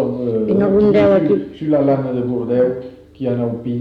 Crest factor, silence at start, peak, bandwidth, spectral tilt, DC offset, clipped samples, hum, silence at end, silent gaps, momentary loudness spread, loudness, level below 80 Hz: 12 dB; 0 s; -4 dBFS; 5.6 kHz; -10 dB/octave; under 0.1%; under 0.1%; none; 0 s; none; 9 LU; -16 LUFS; -46 dBFS